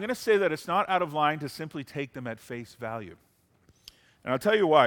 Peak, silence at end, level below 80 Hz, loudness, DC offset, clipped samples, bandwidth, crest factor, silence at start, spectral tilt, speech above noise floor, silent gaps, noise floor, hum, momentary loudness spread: -6 dBFS; 0 s; -68 dBFS; -28 LUFS; under 0.1%; under 0.1%; 18 kHz; 22 dB; 0 s; -5 dB/octave; 37 dB; none; -64 dBFS; none; 15 LU